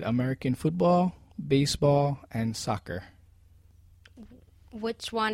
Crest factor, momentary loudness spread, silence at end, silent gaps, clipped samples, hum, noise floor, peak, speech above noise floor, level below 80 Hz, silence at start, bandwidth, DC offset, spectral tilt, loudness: 16 dB; 14 LU; 0 s; none; under 0.1%; none; -57 dBFS; -12 dBFS; 30 dB; -52 dBFS; 0 s; 16 kHz; under 0.1%; -6 dB/octave; -27 LUFS